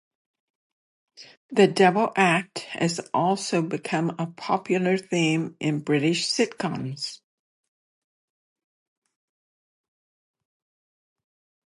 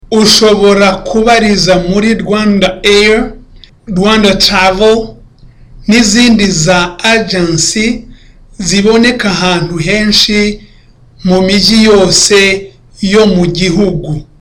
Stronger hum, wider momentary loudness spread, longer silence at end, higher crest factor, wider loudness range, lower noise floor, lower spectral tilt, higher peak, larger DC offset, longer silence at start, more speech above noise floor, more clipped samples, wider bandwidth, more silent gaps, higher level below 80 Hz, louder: neither; about the same, 10 LU vs 9 LU; first, 4.55 s vs 0.2 s; first, 22 dB vs 8 dB; first, 9 LU vs 2 LU; first, under -90 dBFS vs -39 dBFS; about the same, -5 dB/octave vs -4 dB/octave; second, -6 dBFS vs 0 dBFS; neither; first, 1.2 s vs 0.1 s; first, over 66 dB vs 32 dB; neither; second, 11.5 kHz vs 16.5 kHz; first, 1.37-1.49 s vs none; second, -74 dBFS vs -28 dBFS; second, -24 LUFS vs -8 LUFS